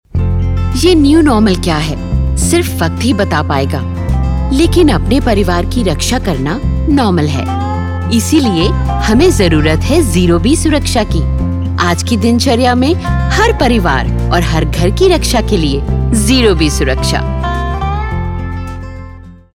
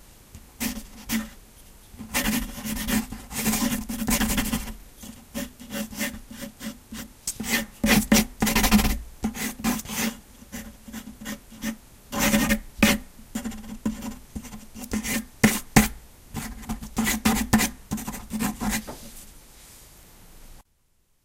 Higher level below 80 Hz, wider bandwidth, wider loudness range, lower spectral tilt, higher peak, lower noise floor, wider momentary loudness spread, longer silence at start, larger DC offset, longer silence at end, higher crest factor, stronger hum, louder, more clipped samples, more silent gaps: first, -18 dBFS vs -38 dBFS; about the same, 16.5 kHz vs 16.5 kHz; second, 2 LU vs 7 LU; first, -5.5 dB/octave vs -3.5 dB/octave; about the same, -2 dBFS vs 0 dBFS; second, -31 dBFS vs -66 dBFS; second, 7 LU vs 19 LU; about the same, 0.15 s vs 0.1 s; neither; second, 0.2 s vs 0.65 s; second, 10 dB vs 26 dB; neither; first, -12 LUFS vs -26 LUFS; neither; neither